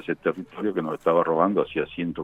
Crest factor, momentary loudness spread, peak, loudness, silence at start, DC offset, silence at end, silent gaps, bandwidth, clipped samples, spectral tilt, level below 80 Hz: 18 dB; 7 LU; -6 dBFS; -25 LUFS; 0 s; under 0.1%; 0 s; none; 8.2 kHz; under 0.1%; -8 dB/octave; -58 dBFS